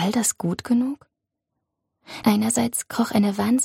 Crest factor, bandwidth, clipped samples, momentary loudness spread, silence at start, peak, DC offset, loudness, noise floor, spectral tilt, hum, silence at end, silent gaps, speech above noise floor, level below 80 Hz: 16 dB; 16.5 kHz; under 0.1%; 8 LU; 0 s; -6 dBFS; under 0.1%; -22 LUFS; -81 dBFS; -4.5 dB/octave; none; 0 s; none; 59 dB; -62 dBFS